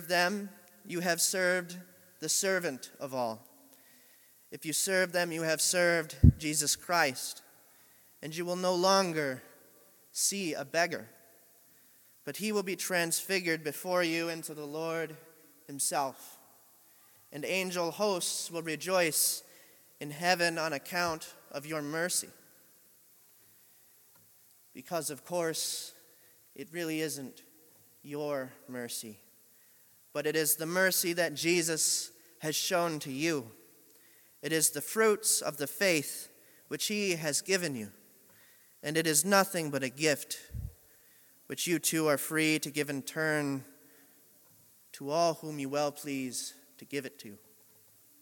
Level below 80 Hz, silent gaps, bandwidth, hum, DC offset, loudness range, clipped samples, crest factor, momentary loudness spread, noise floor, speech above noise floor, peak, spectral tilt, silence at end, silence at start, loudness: -52 dBFS; none; 17.5 kHz; none; under 0.1%; 9 LU; under 0.1%; 26 dB; 16 LU; -62 dBFS; 30 dB; -6 dBFS; -3 dB/octave; 0.85 s; 0 s; -31 LUFS